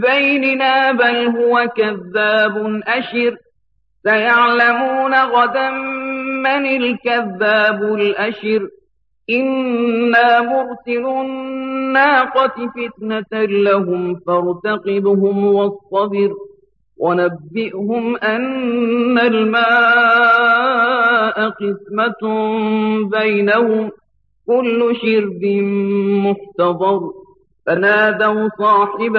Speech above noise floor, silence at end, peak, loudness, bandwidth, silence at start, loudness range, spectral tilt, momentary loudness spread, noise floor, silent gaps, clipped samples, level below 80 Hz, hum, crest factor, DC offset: 52 dB; 0 s; -2 dBFS; -15 LUFS; 5.8 kHz; 0 s; 4 LU; -7.5 dB/octave; 10 LU; -67 dBFS; none; under 0.1%; -64 dBFS; none; 14 dB; under 0.1%